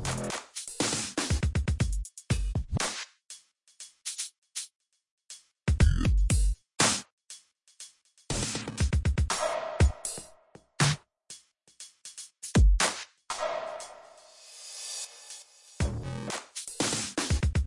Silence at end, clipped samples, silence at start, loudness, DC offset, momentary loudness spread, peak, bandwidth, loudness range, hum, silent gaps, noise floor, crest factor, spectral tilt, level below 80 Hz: 0 s; under 0.1%; 0 s; -30 LUFS; under 0.1%; 23 LU; -10 dBFS; 11.5 kHz; 7 LU; none; 4.38-4.42 s, 4.76-4.80 s, 5.11-5.18 s, 7.12-7.18 s; -57 dBFS; 20 dB; -4 dB/octave; -34 dBFS